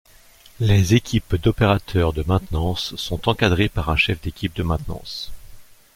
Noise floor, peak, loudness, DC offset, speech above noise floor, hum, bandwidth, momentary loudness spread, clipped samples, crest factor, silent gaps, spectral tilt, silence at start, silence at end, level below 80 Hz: -49 dBFS; -2 dBFS; -21 LUFS; under 0.1%; 29 dB; none; 16 kHz; 10 LU; under 0.1%; 20 dB; none; -6 dB/octave; 0.6 s; 0.3 s; -34 dBFS